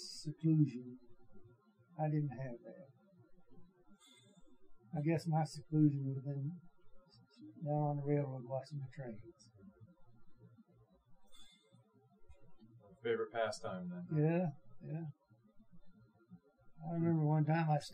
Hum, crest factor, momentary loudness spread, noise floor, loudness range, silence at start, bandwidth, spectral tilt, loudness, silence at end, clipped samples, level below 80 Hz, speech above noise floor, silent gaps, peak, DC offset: none; 20 dB; 20 LU; -69 dBFS; 7 LU; 0 s; 10 kHz; -8 dB/octave; -38 LUFS; 0 s; under 0.1%; -74 dBFS; 32 dB; none; -20 dBFS; under 0.1%